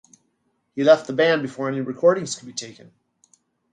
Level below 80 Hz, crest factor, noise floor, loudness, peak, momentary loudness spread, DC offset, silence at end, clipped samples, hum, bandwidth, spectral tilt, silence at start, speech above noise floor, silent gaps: -72 dBFS; 20 dB; -71 dBFS; -20 LUFS; -2 dBFS; 16 LU; under 0.1%; 1 s; under 0.1%; none; 9.6 kHz; -4.5 dB/octave; 0.75 s; 50 dB; none